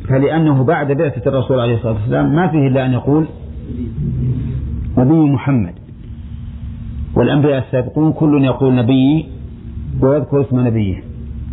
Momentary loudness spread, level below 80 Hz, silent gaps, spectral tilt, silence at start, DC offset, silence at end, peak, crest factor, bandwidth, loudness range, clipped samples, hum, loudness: 16 LU; -32 dBFS; none; -12.5 dB/octave; 0 s; under 0.1%; 0 s; -2 dBFS; 12 dB; 4.1 kHz; 3 LU; under 0.1%; none; -15 LUFS